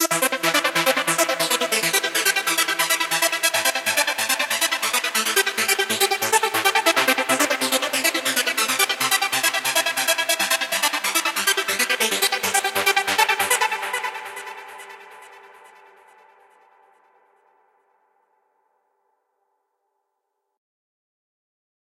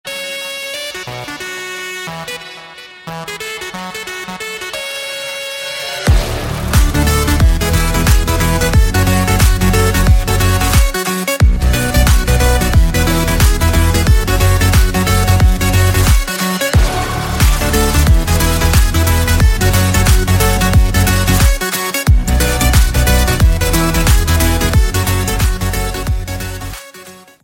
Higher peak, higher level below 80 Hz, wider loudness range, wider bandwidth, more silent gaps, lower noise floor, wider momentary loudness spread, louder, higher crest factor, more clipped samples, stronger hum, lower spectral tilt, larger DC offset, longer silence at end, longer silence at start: about the same, -2 dBFS vs 0 dBFS; second, -80 dBFS vs -16 dBFS; second, 4 LU vs 11 LU; about the same, 16.5 kHz vs 17 kHz; neither; first, -78 dBFS vs -37 dBFS; second, 2 LU vs 11 LU; second, -19 LUFS vs -14 LUFS; first, 20 dB vs 12 dB; neither; neither; second, 0 dB/octave vs -4.5 dB/octave; neither; first, 6.35 s vs 0.3 s; about the same, 0 s vs 0.05 s